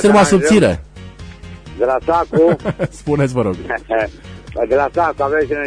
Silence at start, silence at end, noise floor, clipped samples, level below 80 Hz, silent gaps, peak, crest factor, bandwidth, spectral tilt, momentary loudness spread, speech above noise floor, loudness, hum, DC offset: 0 s; 0 s; -34 dBFS; under 0.1%; -38 dBFS; none; -2 dBFS; 14 dB; 10.5 kHz; -6 dB/octave; 24 LU; 19 dB; -16 LUFS; none; under 0.1%